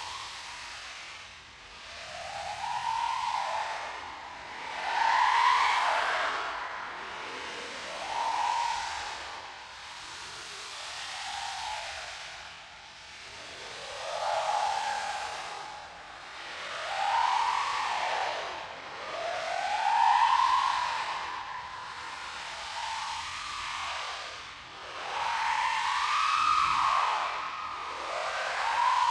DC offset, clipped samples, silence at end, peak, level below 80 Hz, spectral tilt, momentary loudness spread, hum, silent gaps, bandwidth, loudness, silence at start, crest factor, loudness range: under 0.1%; under 0.1%; 0 s; -12 dBFS; -64 dBFS; 0 dB/octave; 17 LU; none; none; 12.5 kHz; -31 LUFS; 0 s; 20 dB; 9 LU